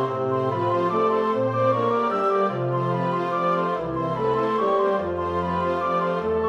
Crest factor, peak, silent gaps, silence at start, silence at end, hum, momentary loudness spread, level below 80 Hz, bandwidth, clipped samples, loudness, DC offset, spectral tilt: 12 dB; -10 dBFS; none; 0 s; 0 s; none; 4 LU; -54 dBFS; 8.8 kHz; under 0.1%; -23 LUFS; under 0.1%; -8 dB/octave